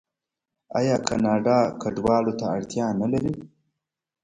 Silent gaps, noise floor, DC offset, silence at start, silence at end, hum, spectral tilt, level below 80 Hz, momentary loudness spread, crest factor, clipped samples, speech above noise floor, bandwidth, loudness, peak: none; -86 dBFS; under 0.1%; 0.75 s; 0.75 s; none; -6 dB/octave; -54 dBFS; 7 LU; 18 dB; under 0.1%; 63 dB; 10.5 kHz; -24 LUFS; -6 dBFS